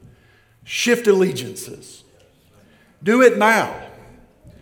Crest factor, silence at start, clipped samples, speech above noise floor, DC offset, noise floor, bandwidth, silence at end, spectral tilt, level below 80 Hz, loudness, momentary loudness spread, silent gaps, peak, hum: 20 dB; 0.65 s; under 0.1%; 36 dB; under 0.1%; -54 dBFS; 18 kHz; 0.75 s; -4 dB/octave; -58 dBFS; -17 LUFS; 21 LU; none; 0 dBFS; none